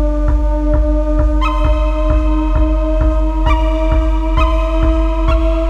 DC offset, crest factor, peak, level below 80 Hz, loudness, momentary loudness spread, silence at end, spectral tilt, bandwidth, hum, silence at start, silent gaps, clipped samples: under 0.1%; 12 dB; 0 dBFS; -14 dBFS; -16 LUFS; 1 LU; 0 s; -8 dB/octave; 5.4 kHz; none; 0 s; none; under 0.1%